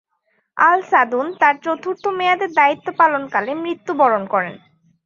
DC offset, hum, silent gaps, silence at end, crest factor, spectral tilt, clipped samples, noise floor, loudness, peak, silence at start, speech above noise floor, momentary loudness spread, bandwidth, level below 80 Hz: under 0.1%; none; none; 0.5 s; 18 dB; -5 dB/octave; under 0.1%; -67 dBFS; -17 LUFS; 0 dBFS; 0.55 s; 50 dB; 9 LU; 7.2 kHz; -70 dBFS